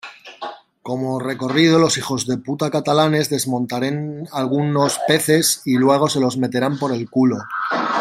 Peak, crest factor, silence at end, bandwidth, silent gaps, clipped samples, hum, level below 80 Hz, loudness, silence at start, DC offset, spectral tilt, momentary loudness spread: -2 dBFS; 18 dB; 0 s; 16 kHz; none; under 0.1%; none; -60 dBFS; -18 LUFS; 0.05 s; under 0.1%; -4.5 dB/octave; 11 LU